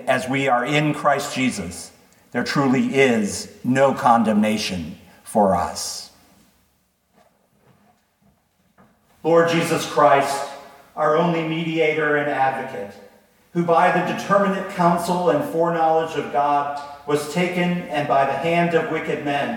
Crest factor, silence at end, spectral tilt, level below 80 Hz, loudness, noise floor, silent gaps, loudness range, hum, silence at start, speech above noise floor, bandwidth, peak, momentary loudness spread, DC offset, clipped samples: 18 dB; 0 s; -5 dB/octave; -58 dBFS; -20 LUFS; -65 dBFS; none; 6 LU; none; 0 s; 45 dB; 19 kHz; -2 dBFS; 13 LU; under 0.1%; under 0.1%